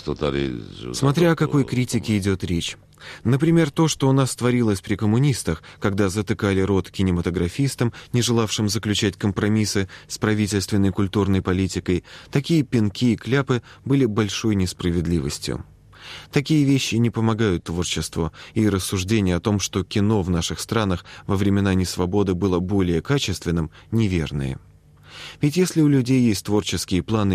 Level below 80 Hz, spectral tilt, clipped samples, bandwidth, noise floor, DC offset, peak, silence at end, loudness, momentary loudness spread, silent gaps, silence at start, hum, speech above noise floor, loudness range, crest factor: -44 dBFS; -5.5 dB/octave; under 0.1%; 15 kHz; -46 dBFS; under 0.1%; -4 dBFS; 0 s; -22 LUFS; 8 LU; none; 0 s; none; 25 dB; 2 LU; 16 dB